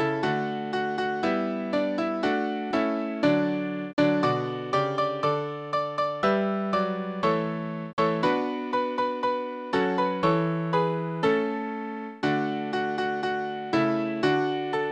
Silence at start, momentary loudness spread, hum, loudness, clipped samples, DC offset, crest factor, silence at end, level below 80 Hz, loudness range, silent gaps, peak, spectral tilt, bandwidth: 0 s; 5 LU; none; -27 LUFS; under 0.1%; under 0.1%; 16 dB; 0 s; -64 dBFS; 1 LU; 3.93-3.97 s, 7.93-7.97 s; -10 dBFS; -7 dB/octave; 9.2 kHz